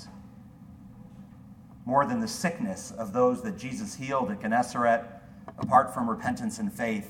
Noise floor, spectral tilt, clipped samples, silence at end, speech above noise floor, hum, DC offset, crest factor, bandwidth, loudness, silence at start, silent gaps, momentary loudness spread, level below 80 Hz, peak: -49 dBFS; -5.5 dB/octave; under 0.1%; 0 s; 21 dB; none; under 0.1%; 22 dB; 17 kHz; -28 LUFS; 0 s; none; 25 LU; -60 dBFS; -8 dBFS